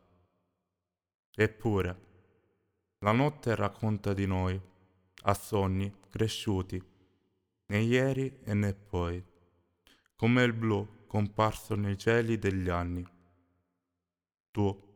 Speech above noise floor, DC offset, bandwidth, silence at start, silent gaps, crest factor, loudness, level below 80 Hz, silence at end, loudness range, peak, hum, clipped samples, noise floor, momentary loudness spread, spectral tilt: 59 dB; under 0.1%; 19 kHz; 1.4 s; 14.34-14.53 s; 22 dB; -31 LUFS; -56 dBFS; 0.15 s; 3 LU; -10 dBFS; none; under 0.1%; -89 dBFS; 10 LU; -6.5 dB/octave